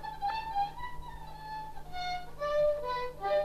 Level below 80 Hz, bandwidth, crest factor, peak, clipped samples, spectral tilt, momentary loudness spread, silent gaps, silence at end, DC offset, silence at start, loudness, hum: -50 dBFS; 14 kHz; 14 dB; -20 dBFS; under 0.1%; -4.5 dB/octave; 14 LU; none; 0 s; under 0.1%; 0 s; -35 LUFS; none